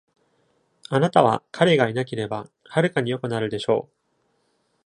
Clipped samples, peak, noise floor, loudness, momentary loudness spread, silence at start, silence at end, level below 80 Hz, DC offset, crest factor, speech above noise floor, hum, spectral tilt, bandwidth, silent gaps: under 0.1%; -2 dBFS; -69 dBFS; -22 LUFS; 9 LU; 0.9 s; 1.05 s; -64 dBFS; under 0.1%; 22 dB; 47 dB; none; -6.5 dB/octave; 10.5 kHz; none